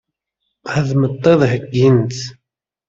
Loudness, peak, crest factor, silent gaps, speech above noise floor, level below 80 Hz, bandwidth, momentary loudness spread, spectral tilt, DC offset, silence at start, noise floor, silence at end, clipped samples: -15 LUFS; -2 dBFS; 14 dB; none; 60 dB; -52 dBFS; 7.6 kHz; 15 LU; -7 dB/octave; under 0.1%; 0.65 s; -74 dBFS; 0.55 s; under 0.1%